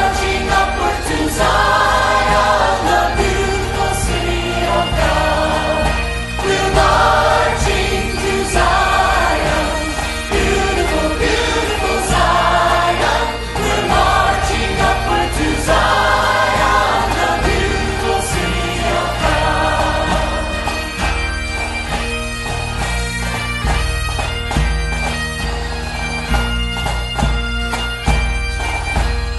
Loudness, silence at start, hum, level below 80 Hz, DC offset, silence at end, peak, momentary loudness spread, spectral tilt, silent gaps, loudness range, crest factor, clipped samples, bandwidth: -16 LUFS; 0 s; none; -22 dBFS; under 0.1%; 0 s; 0 dBFS; 7 LU; -4 dB/octave; none; 5 LU; 16 dB; under 0.1%; 12 kHz